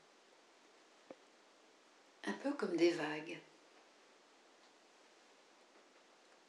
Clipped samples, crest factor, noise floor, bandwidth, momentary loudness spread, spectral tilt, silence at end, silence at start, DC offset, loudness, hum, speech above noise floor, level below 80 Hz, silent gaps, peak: under 0.1%; 22 dB; -67 dBFS; 11 kHz; 30 LU; -4.5 dB/octave; 3.05 s; 1.1 s; under 0.1%; -39 LUFS; none; 29 dB; under -90 dBFS; none; -22 dBFS